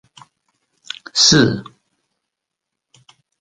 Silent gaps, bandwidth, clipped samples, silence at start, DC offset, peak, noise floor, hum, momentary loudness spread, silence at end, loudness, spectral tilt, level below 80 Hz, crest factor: none; 16 kHz; under 0.1%; 1.15 s; under 0.1%; 0 dBFS; -81 dBFS; none; 22 LU; 1.8 s; -13 LUFS; -3 dB/octave; -52 dBFS; 22 dB